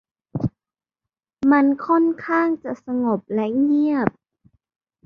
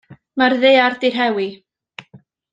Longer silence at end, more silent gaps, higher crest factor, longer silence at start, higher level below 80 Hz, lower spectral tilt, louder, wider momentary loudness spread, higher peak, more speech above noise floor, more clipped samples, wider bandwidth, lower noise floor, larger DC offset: first, 0.95 s vs 0.35 s; neither; about the same, 18 dB vs 16 dB; first, 0.35 s vs 0.1 s; first, -56 dBFS vs -68 dBFS; first, -9.5 dB/octave vs -5 dB/octave; second, -21 LUFS vs -16 LUFS; second, 10 LU vs 13 LU; about the same, -4 dBFS vs -2 dBFS; first, over 71 dB vs 33 dB; neither; second, 5.4 kHz vs 7.6 kHz; first, under -90 dBFS vs -48 dBFS; neither